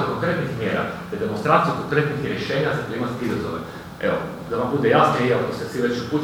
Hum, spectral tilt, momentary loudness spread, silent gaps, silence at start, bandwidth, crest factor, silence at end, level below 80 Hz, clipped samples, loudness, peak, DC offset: none; -6.5 dB/octave; 9 LU; none; 0 s; 17 kHz; 18 dB; 0 s; -52 dBFS; under 0.1%; -22 LUFS; -4 dBFS; under 0.1%